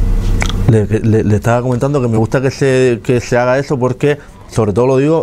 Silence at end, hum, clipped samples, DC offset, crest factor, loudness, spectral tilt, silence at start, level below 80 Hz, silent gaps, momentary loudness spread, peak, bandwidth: 0 s; none; under 0.1%; under 0.1%; 12 dB; -13 LUFS; -7 dB/octave; 0 s; -22 dBFS; none; 5 LU; 0 dBFS; 14 kHz